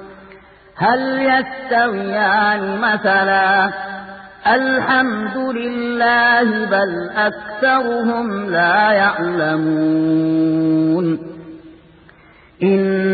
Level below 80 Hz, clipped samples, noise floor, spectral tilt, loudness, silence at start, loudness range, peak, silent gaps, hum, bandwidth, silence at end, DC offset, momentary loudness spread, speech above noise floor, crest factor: -56 dBFS; under 0.1%; -47 dBFS; -11 dB/octave; -16 LUFS; 0 s; 2 LU; -2 dBFS; none; none; 4.8 kHz; 0 s; under 0.1%; 8 LU; 31 dB; 14 dB